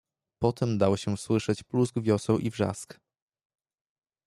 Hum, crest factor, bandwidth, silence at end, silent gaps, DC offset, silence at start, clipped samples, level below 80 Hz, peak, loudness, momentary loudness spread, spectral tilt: none; 20 dB; 12.5 kHz; 1.35 s; none; under 0.1%; 0.4 s; under 0.1%; -62 dBFS; -10 dBFS; -28 LUFS; 5 LU; -6.5 dB/octave